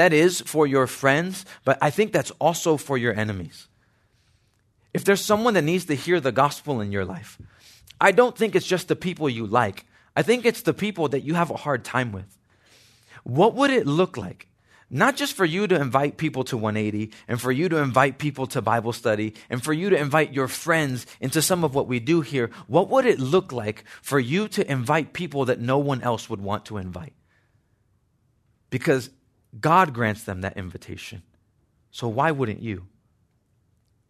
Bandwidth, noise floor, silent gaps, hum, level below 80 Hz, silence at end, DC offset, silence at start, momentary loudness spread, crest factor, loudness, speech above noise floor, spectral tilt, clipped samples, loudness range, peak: 14 kHz; -66 dBFS; none; none; -64 dBFS; 1.25 s; under 0.1%; 0 s; 12 LU; 22 dB; -23 LUFS; 44 dB; -5 dB/octave; under 0.1%; 5 LU; -2 dBFS